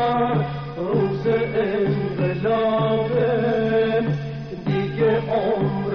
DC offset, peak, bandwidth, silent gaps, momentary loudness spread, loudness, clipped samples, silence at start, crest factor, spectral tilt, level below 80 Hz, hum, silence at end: under 0.1%; -10 dBFS; 6 kHz; none; 5 LU; -22 LUFS; under 0.1%; 0 s; 12 dB; -6.5 dB/octave; -48 dBFS; none; 0 s